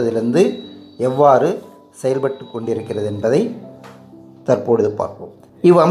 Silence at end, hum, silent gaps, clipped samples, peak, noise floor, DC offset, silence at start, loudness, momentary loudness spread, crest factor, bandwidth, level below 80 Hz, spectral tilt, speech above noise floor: 0 s; none; none; under 0.1%; 0 dBFS; -41 dBFS; under 0.1%; 0 s; -17 LUFS; 20 LU; 16 dB; 12 kHz; -64 dBFS; -7.5 dB/octave; 25 dB